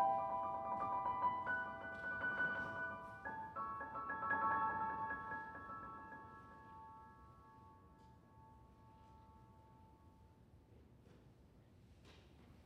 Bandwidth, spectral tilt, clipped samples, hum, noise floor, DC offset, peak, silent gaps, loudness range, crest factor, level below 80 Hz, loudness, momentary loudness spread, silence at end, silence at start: 11.5 kHz; -6.5 dB/octave; under 0.1%; none; -66 dBFS; under 0.1%; -26 dBFS; none; 23 LU; 20 dB; -70 dBFS; -43 LUFS; 26 LU; 0 s; 0 s